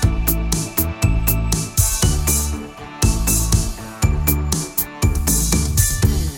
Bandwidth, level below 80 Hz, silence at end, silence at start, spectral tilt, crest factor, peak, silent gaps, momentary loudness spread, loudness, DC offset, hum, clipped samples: 18 kHz; -22 dBFS; 0 s; 0 s; -4 dB/octave; 16 dB; -2 dBFS; none; 5 LU; -18 LUFS; under 0.1%; none; under 0.1%